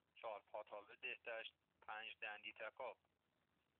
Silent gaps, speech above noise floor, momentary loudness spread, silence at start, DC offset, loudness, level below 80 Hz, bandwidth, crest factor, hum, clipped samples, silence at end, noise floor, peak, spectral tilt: none; 32 dB; 7 LU; 0.15 s; under 0.1%; -53 LUFS; under -90 dBFS; 4.2 kHz; 18 dB; none; under 0.1%; 0.85 s; -86 dBFS; -36 dBFS; 2 dB/octave